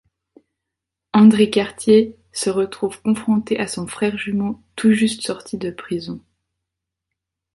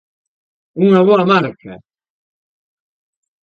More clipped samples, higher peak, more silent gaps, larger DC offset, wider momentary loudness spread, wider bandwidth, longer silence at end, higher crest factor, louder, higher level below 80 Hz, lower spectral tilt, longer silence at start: neither; about the same, -2 dBFS vs 0 dBFS; neither; neither; about the same, 14 LU vs 14 LU; first, 11.5 kHz vs 6.8 kHz; second, 1.35 s vs 1.65 s; about the same, 18 dB vs 16 dB; second, -19 LUFS vs -13 LUFS; first, -56 dBFS vs -64 dBFS; second, -5.5 dB/octave vs -8 dB/octave; first, 1.15 s vs 0.75 s